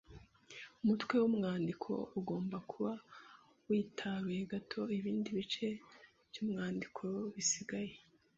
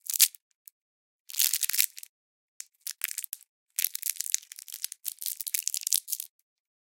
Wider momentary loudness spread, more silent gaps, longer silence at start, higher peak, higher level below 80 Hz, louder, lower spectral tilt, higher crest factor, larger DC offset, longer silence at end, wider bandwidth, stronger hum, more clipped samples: second, 15 LU vs 18 LU; second, none vs 0.42-0.65 s, 0.72-1.26 s, 2.09-2.60 s, 3.48-3.66 s; about the same, 0.1 s vs 0.05 s; second, -20 dBFS vs 0 dBFS; first, -72 dBFS vs under -90 dBFS; second, -39 LUFS vs -28 LUFS; first, -5.5 dB/octave vs 9 dB/octave; second, 20 dB vs 34 dB; neither; second, 0.4 s vs 0.6 s; second, 7.6 kHz vs 17.5 kHz; neither; neither